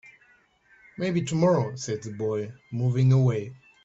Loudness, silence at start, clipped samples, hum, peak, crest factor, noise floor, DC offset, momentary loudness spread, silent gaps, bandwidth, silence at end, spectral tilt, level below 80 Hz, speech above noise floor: -26 LUFS; 1 s; under 0.1%; none; -10 dBFS; 16 dB; -61 dBFS; under 0.1%; 12 LU; none; 8 kHz; 0.3 s; -7 dB/octave; -62 dBFS; 37 dB